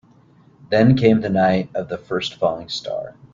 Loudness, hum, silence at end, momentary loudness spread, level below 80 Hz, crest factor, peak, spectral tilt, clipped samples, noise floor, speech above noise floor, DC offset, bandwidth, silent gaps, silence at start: -19 LUFS; none; 0.2 s; 13 LU; -50 dBFS; 18 dB; -2 dBFS; -7 dB/octave; under 0.1%; -52 dBFS; 33 dB; under 0.1%; 7.6 kHz; none; 0.7 s